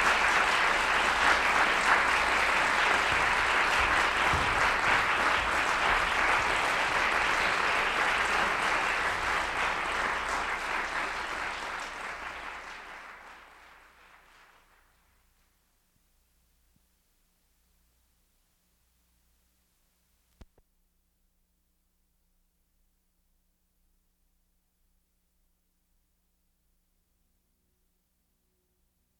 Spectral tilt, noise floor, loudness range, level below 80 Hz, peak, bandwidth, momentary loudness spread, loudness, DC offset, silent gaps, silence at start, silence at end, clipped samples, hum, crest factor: -2 dB/octave; -75 dBFS; 15 LU; -52 dBFS; -10 dBFS; 17 kHz; 13 LU; -26 LUFS; under 0.1%; none; 0 s; 15.8 s; under 0.1%; none; 20 dB